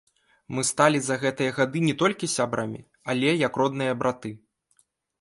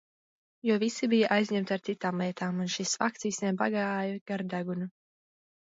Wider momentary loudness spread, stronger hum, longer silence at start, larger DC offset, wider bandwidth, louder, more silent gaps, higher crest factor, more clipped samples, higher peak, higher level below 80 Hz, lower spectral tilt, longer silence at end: first, 13 LU vs 8 LU; neither; second, 0.5 s vs 0.65 s; neither; first, 11.5 kHz vs 8 kHz; first, -25 LUFS vs -30 LUFS; second, none vs 4.21-4.26 s; about the same, 22 dB vs 20 dB; neither; first, -4 dBFS vs -10 dBFS; first, -66 dBFS vs -78 dBFS; about the same, -4.5 dB/octave vs -4.5 dB/octave; about the same, 0.85 s vs 0.85 s